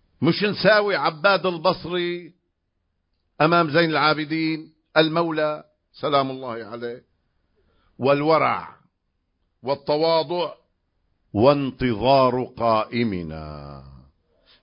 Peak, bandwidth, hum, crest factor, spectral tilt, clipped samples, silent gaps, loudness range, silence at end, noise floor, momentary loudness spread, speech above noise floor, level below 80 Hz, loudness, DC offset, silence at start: -2 dBFS; 5.4 kHz; none; 20 dB; -10 dB/octave; under 0.1%; none; 4 LU; 0.75 s; -74 dBFS; 16 LU; 53 dB; -52 dBFS; -21 LUFS; under 0.1%; 0.2 s